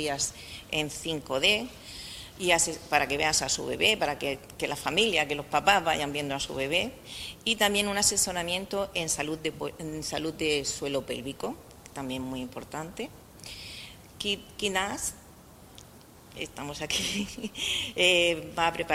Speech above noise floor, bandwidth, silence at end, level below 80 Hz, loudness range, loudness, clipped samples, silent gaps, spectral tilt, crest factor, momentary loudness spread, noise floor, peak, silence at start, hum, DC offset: 22 dB; 16 kHz; 0 s; -54 dBFS; 8 LU; -28 LUFS; under 0.1%; none; -2 dB/octave; 24 dB; 16 LU; -52 dBFS; -6 dBFS; 0 s; none; under 0.1%